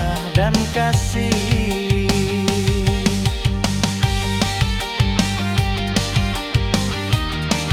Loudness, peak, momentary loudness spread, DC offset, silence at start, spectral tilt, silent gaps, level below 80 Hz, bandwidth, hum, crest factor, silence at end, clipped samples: -19 LUFS; -2 dBFS; 2 LU; under 0.1%; 0 s; -5 dB/octave; none; -28 dBFS; 17.5 kHz; none; 16 dB; 0 s; under 0.1%